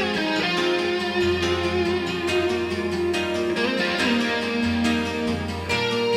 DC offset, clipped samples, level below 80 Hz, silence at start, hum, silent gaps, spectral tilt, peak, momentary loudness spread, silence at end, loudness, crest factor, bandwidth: under 0.1%; under 0.1%; -48 dBFS; 0 s; none; none; -4.5 dB/octave; -10 dBFS; 4 LU; 0 s; -23 LUFS; 14 dB; 14 kHz